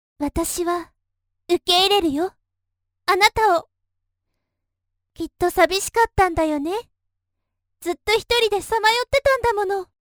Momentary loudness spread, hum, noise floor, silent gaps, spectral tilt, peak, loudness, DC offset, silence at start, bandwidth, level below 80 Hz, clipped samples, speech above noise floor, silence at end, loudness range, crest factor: 12 LU; none; -79 dBFS; none; -3 dB/octave; 0 dBFS; -20 LUFS; under 0.1%; 0.2 s; over 20 kHz; -42 dBFS; under 0.1%; 59 dB; 0.2 s; 2 LU; 22 dB